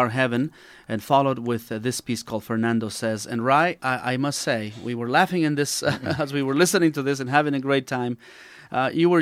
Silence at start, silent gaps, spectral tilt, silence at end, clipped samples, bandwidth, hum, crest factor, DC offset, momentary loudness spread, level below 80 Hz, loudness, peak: 0 s; none; -5 dB/octave; 0 s; under 0.1%; 16 kHz; none; 20 dB; under 0.1%; 9 LU; -64 dBFS; -23 LUFS; -4 dBFS